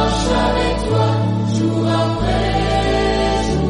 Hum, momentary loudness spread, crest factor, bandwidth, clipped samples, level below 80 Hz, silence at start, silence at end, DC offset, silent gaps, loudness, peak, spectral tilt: none; 2 LU; 12 dB; 10.5 kHz; under 0.1%; -26 dBFS; 0 s; 0 s; under 0.1%; none; -17 LUFS; -4 dBFS; -6 dB/octave